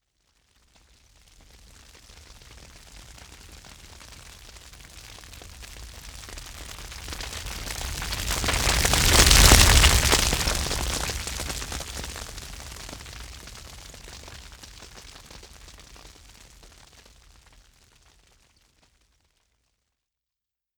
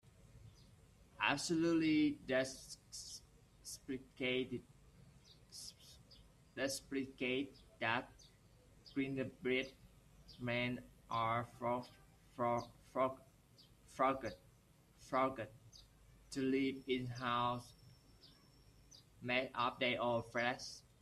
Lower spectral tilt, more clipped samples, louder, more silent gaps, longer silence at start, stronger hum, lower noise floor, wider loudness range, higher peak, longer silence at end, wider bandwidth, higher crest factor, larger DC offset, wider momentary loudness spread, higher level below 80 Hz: second, -2 dB/octave vs -4.5 dB/octave; neither; first, -21 LUFS vs -40 LUFS; neither; first, 2.95 s vs 0.35 s; neither; first, -88 dBFS vs -68 dBFS; first, 26 LU vs 6 LU; first, 0 dBFS vs -20 dBFS; first, 5.1 s vs 0.2 s; first, over 20 kHz vs 14 kHz; about the same, 26 dB vs 24 dB; neither; first, 29 LU vs 18 LU; first, -32 dBFS vs -70 dBFS